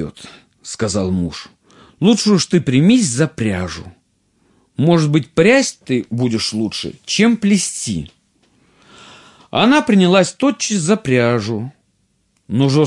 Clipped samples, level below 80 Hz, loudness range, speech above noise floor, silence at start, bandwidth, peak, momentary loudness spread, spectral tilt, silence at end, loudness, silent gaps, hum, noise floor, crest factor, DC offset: under 0.1%; -52 dBFS; 3 LU; 48 dB; 0 s; 11.5 kHz; 0 dBFS; 14 LU; -5 dB/octave; 0 s; -16 LUFS; none; none; -63 dBFS; 16 dB; under 0.1%